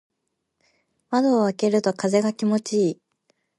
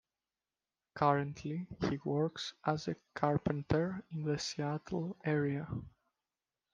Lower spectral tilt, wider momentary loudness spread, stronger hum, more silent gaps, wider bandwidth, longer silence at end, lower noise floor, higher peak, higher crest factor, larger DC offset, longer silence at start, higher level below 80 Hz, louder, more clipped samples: about the same, -6 dB/octave vs -6.5 dB/octave; second, 5 LU vs 9 LU; neither; neither; first, 11.5 kHz vs 9.2 kHz; second, 0.65 s vs 0.85 s; second, -78 dBFS vs under -90 dBFS; first, -6 dBFS vs -14 dBFS; second, 18 dB vs 24 dB; neither; first, 1.1 s vs 0.95 s; second, -72 dBFS vs -62 dBFS; first, -22 LUFS vs -36 LUFS; neither